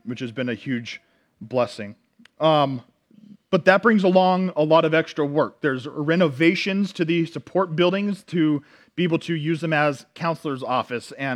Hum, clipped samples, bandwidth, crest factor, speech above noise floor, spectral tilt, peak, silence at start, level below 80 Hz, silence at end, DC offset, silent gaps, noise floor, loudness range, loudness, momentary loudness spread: none; under 0.1%; 11.5 kHz; 22 dB; 28 dB; -6.5 dB/octave; -2 dBFS; 0.05 s; -72 dBFS; 0 s; under 0.1%; none; -50 dBFS; 5 LU; -22 LUFS; 11 LU